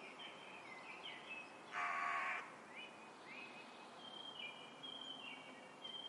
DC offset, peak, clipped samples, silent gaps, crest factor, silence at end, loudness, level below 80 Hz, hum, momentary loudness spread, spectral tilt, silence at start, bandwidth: under 0.1%; -30 dBFS; under 0.1%; none; 20 dB; 0 s; -48 LUFS; under -90 dBFS; none; 13 LU; -2 dB/octave; 0 s; 11.5 kHz